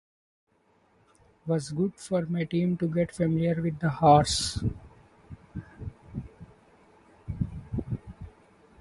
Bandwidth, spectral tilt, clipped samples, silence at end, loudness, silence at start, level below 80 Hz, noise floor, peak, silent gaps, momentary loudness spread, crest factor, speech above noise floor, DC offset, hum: 11.5 kHz; -6 dB/octave; under 0.1%; 0.55 s; -27 LUFS; 1.45 s; -48 dBFS; -66 dBFS; -6 dBFS; none; 22 LU; 24 dB; 40 dB; under 0.1%; none